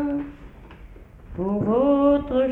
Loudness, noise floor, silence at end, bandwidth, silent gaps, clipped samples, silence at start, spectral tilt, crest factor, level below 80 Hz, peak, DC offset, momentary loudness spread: -21 LUFS; -44 dBFS; 0 s; 3.9 kHz; none; under 0.1%; 0 s; -10 dB/octave; 14 dB; -44 dBFS; -8 dBFS; under 0.1%; 17 LU